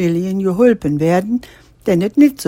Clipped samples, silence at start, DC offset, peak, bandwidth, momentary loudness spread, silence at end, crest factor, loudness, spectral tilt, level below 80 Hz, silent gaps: under 0.1%; 0 s; under 0.1%; 0 dBFS; 16.5 kHz; 9 LU; 0.05 s; 14 dB; -16 LUFS; -7.5 dB/octave; -46 dBFS; none